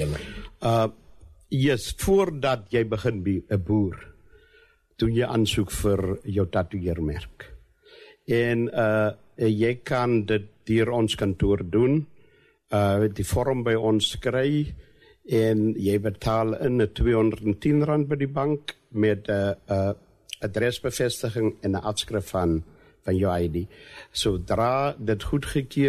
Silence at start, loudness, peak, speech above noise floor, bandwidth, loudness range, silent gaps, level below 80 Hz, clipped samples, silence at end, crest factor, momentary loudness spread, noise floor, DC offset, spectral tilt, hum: 0 s; -25 LUFS; -12 dBFS; 35 dB; 13.5 kHz; 3 LU; none; -42 dBFS; under 0.1%; 0 s; 14 dB; 8 LU; -59 dBFS; under 0.1%; -6 dB/octave; none